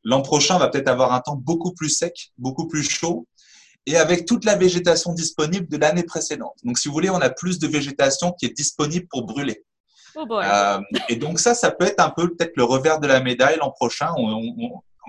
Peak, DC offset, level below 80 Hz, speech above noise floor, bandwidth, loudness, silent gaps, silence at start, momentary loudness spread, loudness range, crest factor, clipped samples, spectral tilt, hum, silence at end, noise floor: -2 dBFS; under 0.1%; -56 dBFS; 32 dB; 11.5 kHz; -20 LUFS; 9.80-9.84 s; 0.05 s; 11 LU; 4 LU; 18 dB; under 0.1%; -3.5 dB/octave; none; 0 s; -52 dBFS